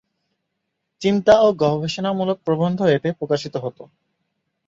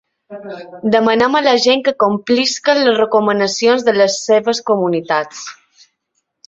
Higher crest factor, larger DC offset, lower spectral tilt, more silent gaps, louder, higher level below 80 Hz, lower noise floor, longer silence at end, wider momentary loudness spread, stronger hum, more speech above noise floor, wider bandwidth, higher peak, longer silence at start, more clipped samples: first, 20 dB vs 14 dB; neither; first, -6.5 dB/octave vs -3.5 dB/octave; neither; second, -19 LUFS vs -14 LUFS; about the same, -56 dBFS vs -60 dBFS; first, -77 dBFS vs -70 dBFS; about the same, 0.85 s vs 0.95 s; second, 10 LU vs 17 LU; neither; about the same, 58 dB vs 56 dB; about the same, 7.8 kHz vs 8 kHz; about the same, -2 dBFS vs 0 dBFS; first, 1 s vs 0.3 s; neither